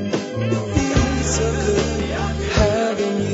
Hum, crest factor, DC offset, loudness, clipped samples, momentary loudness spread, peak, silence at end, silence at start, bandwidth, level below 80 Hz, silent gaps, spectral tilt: none; 16 dB; under 0.1%; -20 LUFS; under 0.1%; 5 LU; -4 dBFS; 0 s; 0 s; 8 kHz; -28 dBFS; none; -5 dB/octave